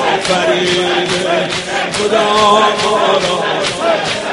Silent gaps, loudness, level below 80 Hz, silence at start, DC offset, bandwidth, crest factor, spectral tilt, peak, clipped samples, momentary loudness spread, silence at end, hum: none; -13 LUFS; -48 dBFS; 0 s; under 0.1%; 11.5 kHz; 14 dB; -3 dB/octave; 0 dBFS; under 0.1%; 6 LU; 0 s; none